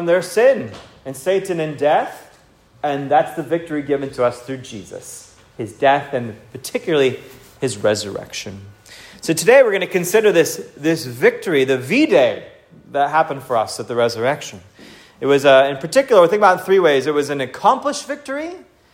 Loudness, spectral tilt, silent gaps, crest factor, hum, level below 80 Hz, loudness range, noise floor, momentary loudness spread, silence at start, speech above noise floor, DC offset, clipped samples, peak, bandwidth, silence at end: -17 LUFS; -4.5 dB/octave; none; 18 dB; none; -60 dBFS; 7 LU; -51 dBFS; 19 LU; 0 s; 34 dB; under 0.1%; under 0.1%; 0 dBFS; 16.5 kHz; 0.35 s